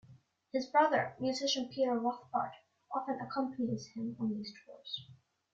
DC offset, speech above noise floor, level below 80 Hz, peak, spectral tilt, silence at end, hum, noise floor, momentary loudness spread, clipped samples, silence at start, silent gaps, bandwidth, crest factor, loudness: under 0.1%; 27 dB; -78 dBFS; -16 dBFS; -4.5 dB/octave; 0.4 s; none; -62 dBFS; 13 LU; under 0.1%; 0.1 s; none; 7.8 kHz; 20 dB; -35 LUFS